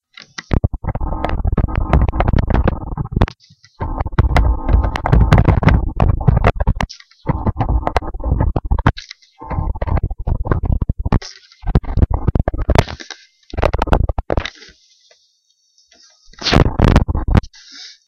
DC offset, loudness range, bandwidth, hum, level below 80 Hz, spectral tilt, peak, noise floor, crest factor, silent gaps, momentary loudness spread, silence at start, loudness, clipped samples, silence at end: under 0.1%; 5 LU; 8 kHz; none; -20 dBFS; -7 dB/octave; 0 dBFS; -61 dBFS; 16 dB; none; 15 LU; 0.4 s; -18 LUFS; under 0.1%; 0.15 s